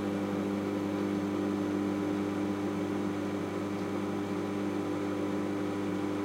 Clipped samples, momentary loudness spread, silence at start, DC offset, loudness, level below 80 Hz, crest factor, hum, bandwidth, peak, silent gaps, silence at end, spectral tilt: under 0.1%; 2 LU; 0 s; under 0.1%; -33 LUFS; -70 dBFS; 12 dB; 50 Hz at -40 dBFS; 16 kHz; -20 dBFS; none; 0 s; -7 dB/octave